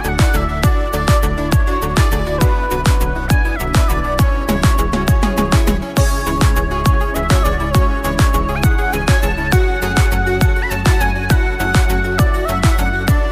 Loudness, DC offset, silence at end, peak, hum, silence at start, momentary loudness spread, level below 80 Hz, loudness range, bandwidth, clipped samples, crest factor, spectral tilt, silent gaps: -16 LUFS; under 0.1%; 0 s; -2 dBFS; none; 0 s; 2 LU; -16 dBFS; 1 LU; 16 kHz; under 0.1%; 12 dB; -5.5 dB/octave; none